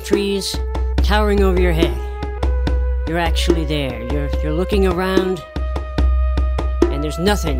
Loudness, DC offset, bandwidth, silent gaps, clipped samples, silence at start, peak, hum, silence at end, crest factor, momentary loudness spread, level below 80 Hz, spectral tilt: -19 LUFS; under 0.1%; 15.5 kHz; none; under 0.1%; 0 s; 0 dBFS; none; 0 s; 16 dB; 7 LU; -20 dBFS; -6 dB/octave